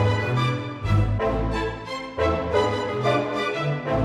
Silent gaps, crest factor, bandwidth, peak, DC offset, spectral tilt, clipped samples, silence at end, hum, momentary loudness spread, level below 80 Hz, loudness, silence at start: none; 14 dB; 11 kHz; -8 dBFS; under 0.1%; -7 dB/octave; under 0.1%; 0 s; none; 6 LU; -36 dBFS; -24 LUFS; 0 s